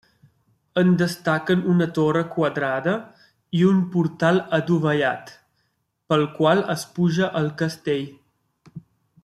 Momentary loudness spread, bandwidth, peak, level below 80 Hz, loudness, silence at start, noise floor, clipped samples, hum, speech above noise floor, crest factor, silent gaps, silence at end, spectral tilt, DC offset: 8 LU; 13 kHz; -4 dBFS; -64 dBFS; -22 LUFS; 0.75 s; -72 dBFS; under 0.1%; none; 51 dB; 18 dB; none; 0.45 s; -7 dB/octave; under 0.1%